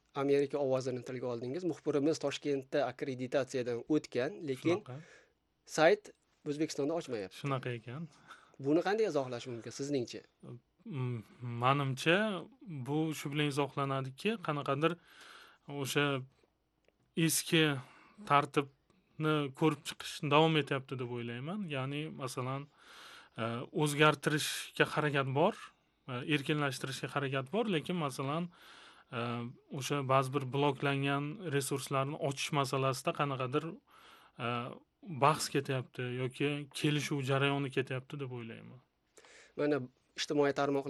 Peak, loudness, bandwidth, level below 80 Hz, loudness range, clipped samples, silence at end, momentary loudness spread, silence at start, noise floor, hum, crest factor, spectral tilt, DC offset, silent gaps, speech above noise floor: -10 dBFS; -34 LUFS; 12.5 kHz; -78 dBFS; 4 LU; under 0.1%; 0 s; 16 LU; 0.15 s; -75 dBFS; none; 24 dB; -5 dB/octave; under 0.1%; none; 41 dB